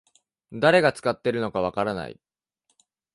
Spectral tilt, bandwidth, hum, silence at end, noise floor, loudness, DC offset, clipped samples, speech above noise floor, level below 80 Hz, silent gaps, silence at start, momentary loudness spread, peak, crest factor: -5.5 dB/octave; 11.5 kHz; none; 1 s; -74 dBFS; -23 LUFS; under 0.1%; under 0.1%; 51 dB; -58 dBFS; none; 0.5 s; 16 LU; -6 dBFS; 20 dB